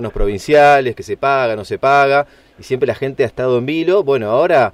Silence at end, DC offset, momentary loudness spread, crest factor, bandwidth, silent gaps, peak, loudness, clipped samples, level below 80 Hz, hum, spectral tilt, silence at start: 0.05 s; under 0.1%; 10 LU; 12 dB; 13.5 kHz; none; -2 dBFS; -15 LUFS; under 0.1%; -32 dBFS; none; -6 dB/octave; 0 s